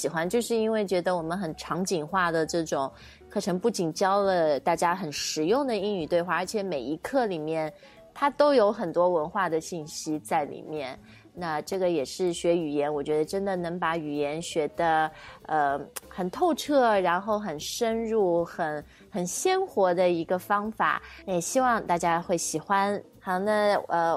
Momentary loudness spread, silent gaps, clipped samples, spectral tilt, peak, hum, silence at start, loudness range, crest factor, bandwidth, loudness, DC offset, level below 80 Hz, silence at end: 9 LU; none; under 0.1%; -4.5 dB/octave; -10 dBFS; none; 0 s; 3 LU; 18 dB; 16 kHz; -27 LUFS; under 0.1%; -60 dBFS; 0 s